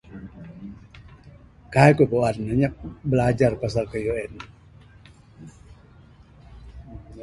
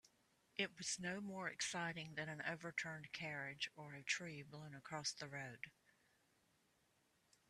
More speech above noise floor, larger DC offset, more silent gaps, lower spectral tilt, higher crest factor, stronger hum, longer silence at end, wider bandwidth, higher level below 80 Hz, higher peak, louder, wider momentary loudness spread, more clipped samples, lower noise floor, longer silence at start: about the same, 29 dB vs 32 dB; neither; neither; first, -7.5 dB/octave vs -2.5 dB/octave; about the same, 24 dB vs 24 dB; neither; second, 0 s vs 1.8 s; second, 11.5 kHz vs 13.5 kHz; first, -46 dBFS vs -84 dBFS; first, -2 dBFS vs -26 dBFS; first, -22 LUFS vs -47 LUFS; first, 26 LU vs 9 LU; neither; second, -50 dBFS vs -80 dBFS; about the same, 0.1 s vs 0.05 s